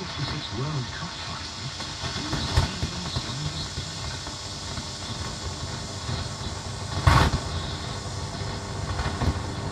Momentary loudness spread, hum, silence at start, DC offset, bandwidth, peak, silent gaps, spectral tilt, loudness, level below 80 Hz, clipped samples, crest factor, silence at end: 8 LU; none; 0 s; under 0.1%; 14 kHz; -4 dBFS; none; -4 dB/octave; -29 LUFS; -38 dBFS; under 0.1%; 24 dB; 0 s